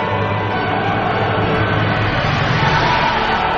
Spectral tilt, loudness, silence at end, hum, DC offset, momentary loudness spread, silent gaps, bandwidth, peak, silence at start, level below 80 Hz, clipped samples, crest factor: -6.5 dB/octave; -16 LUFS; 0 s; none; under 0.1%; 4 LU; none; 7.2 kHz; -4 dBFS; 0 s; -34 dBFS; under 0.1%; 14 dB